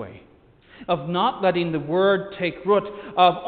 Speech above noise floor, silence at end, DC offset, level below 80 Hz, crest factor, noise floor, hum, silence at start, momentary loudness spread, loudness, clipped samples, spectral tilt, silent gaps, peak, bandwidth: 32 dB; 0 s; under 0.1%; -58 dBFS; 20 dB; -53 dBFS; none; 0 s; 9 LU; -22 LUFS; under 0.1%; -8.5 dB/octave; none; -4 dBFS; 4.7 kHz